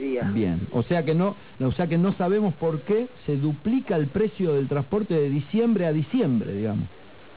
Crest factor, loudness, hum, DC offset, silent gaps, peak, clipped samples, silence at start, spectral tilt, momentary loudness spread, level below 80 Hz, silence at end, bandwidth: 12 dB; -25 LUFS; none; 0.4%; none; -12 dBFS; under 0.1%; 0 s; -12 dB/octave; 5 LU; -50 dBFS; 0.5 s; 4 kHz